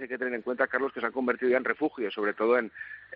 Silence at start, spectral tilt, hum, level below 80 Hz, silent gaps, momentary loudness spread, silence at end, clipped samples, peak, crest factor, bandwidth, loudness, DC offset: 0 s; -2.5 dB/octave; none; -76 dBFS; none; 6 LU; 0 s; under 0.1%; -10 dBFS; 18 dB; 5.2 kHz; -28 LUFS; under 0.1%